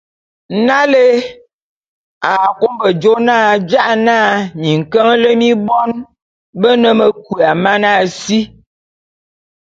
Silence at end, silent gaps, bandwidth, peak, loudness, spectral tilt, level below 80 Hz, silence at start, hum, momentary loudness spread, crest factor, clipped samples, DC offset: 1.15 s; 1.53-2.21 s, 6.22-6.53 s; 7.8 kHz; 0 dBFS; -12 LUFS; -5.5 dB/octave; -56 dBFS; 0.5 s; none; 7 LU; 12 dB; under 0.1%; under 0.1%